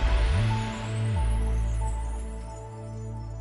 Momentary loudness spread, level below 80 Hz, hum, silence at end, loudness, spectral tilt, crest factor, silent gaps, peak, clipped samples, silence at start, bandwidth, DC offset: 13 LU; -28 dBFS; none; 0 s; -30 LUFS; -6 dB/octave; 14 dB; none; -14 dBFS; under 0.1%; 0 s; 11.5 kHz; under 0.1%